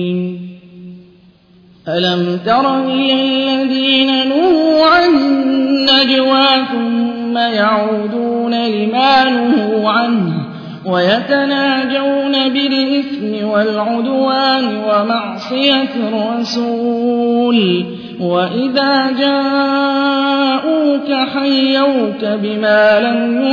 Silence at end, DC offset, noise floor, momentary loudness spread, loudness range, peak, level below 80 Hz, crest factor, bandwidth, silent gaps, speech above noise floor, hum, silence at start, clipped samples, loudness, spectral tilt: 0 s; under 0.1%; -46 dBFS; 7 LU; 4 LU; 0 dBFS; -56 dBFS; 14 dB; 5.4 kHz; none; 33 dB; none; 0 s; under 0.1%; -13 LUFS; -6 dB/octave